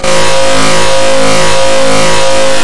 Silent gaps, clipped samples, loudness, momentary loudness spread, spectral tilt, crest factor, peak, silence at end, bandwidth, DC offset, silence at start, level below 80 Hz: none; 7%; -8 LUFS; 1 LU; -2.5 dB/octave; 12 dB; 0 dBFS; 0 s; 12 kHz; 50%; 0 s; -30 dBFS